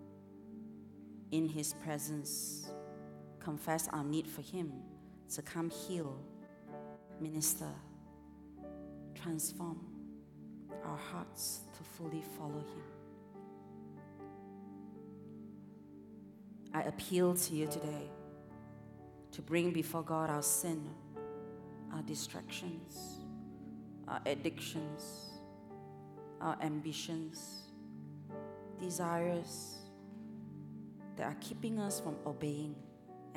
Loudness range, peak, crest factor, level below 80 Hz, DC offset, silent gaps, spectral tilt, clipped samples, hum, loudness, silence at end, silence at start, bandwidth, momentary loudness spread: 8 LU; -20 dBFS; 22 dB; -72 dBFS; under 0.1%; none; -4.5 dB/octave; under 0.1%; 50 Hz at -70 dBFS; -41 LUFS; 0 s; 0 s; 18.5 kHz; 18 LU